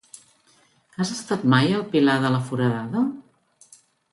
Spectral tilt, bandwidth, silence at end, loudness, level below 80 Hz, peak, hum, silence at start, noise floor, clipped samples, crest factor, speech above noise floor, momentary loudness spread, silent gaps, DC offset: -6 dB/octave; 11.5 kHz; 0.9 s; -22 LUFS; -64 dBFS; -4 dBFS; none; 1 s; -60 dBFS; under 0.1%; 20 dB; 39 dB; 9 LU; none; under 0.1%